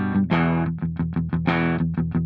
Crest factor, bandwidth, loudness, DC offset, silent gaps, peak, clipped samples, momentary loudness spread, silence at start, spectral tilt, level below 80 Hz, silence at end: 16 dB; 5 kHz; -23 LUFS; under 0.1%; none; -6 dBFS; under 0.1%; 5 LU; 0 s; -10 dB/octave; -44 dBFS; 0 s